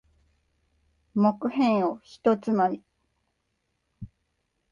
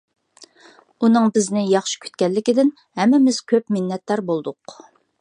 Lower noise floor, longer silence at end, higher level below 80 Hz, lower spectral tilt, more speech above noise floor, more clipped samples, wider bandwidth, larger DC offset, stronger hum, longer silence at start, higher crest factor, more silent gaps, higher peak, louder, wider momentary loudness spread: first, -77 dBFS vs -51 dBFS; first, 0.65 s vs 0.5 s; first, -64 dBFS vs -72 dBFS; first, -8 dB/octave vs -5 dB/octave; first, 52 dB vs 32 dB; neither; second, 7.4 kHz vs 10.5 kHz; neither; neither; first, 1.15 s vs 1 s; about the same, 18 dB vs 16 dB; neither; second, -10 dBFS vs -4 dBFS; second, -25 LUFS vs -19 LUFS; about the same, 7 LU vs 9 LU